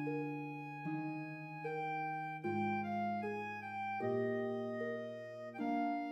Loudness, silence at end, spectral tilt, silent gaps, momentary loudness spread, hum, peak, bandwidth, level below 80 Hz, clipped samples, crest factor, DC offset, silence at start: -41 LUFS; 0 s; -8 dB/octave; none; 8 LU; none; -26 dBFS; 12.5 kHz; under -90 dBFS; under 0.1%; 14 dB; under 0.1%; 0 s